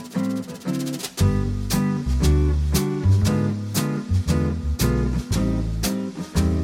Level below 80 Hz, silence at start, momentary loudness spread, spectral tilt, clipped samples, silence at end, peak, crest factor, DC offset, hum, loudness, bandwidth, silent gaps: -28 dBFS; 0 s; 7 LU; -6 dB/octave; under 0.1%; 0 s; -6 dBFS; 14 dB; under 0.1%; none; -23 LUFS; 16.5 kHz; none